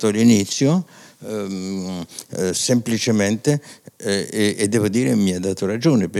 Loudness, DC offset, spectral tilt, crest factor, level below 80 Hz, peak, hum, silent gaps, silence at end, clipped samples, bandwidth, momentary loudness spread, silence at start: -20 LUFS; under 0.1%; -5 dB/octave; 16 dB; -68 dBFS; -4 dBFS; none; none; 0 s; under 0.1%; 15 kHz; 13 LU; 0 s